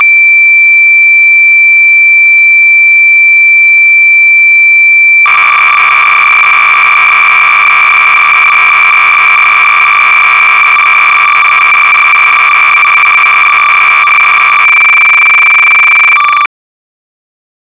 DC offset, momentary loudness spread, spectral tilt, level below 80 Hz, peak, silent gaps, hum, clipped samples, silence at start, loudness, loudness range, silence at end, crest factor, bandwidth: under 0.1%; 2 LU; -3 dB/octave; -54 dBFS; 0 dBFS; none; none; 0.5%; 0 s; -1 LUFS; 2 LU; 1.15 s; 4 dB; 4 kHz